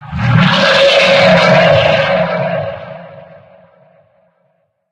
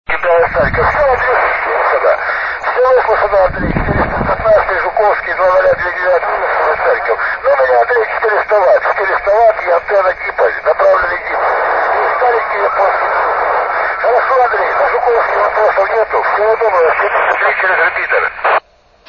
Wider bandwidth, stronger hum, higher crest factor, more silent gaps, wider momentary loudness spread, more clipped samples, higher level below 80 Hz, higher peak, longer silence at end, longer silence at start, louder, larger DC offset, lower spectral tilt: first, 10.5 kHz vs 6.6 kHz; neither; about the same, 12 dB vs 12 dB; neither; first, 17 LU vs 4 LU; neither; second, -40 dBFS vs -34 dBFS; about the same, 0 dBFS vs 0 dBFS; first, 1.7 s vs 0.5 s; about the same, 0 s vs 0.1 s; first, -9 LUFS vs -12 LUFS; neither; second, -5.5 dB/octave vs -7 dB/octave